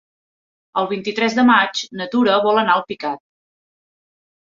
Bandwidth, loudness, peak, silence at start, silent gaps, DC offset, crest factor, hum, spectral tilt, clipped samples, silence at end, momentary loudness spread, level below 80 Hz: 7.6 kHz; -18 LUFS; 0 dBFS; 0.75 s; none; under 0.1%; 20 dB; none; -4 dB/octave; under 0.1%; 1.35 s; 13 LU; -66 dBFS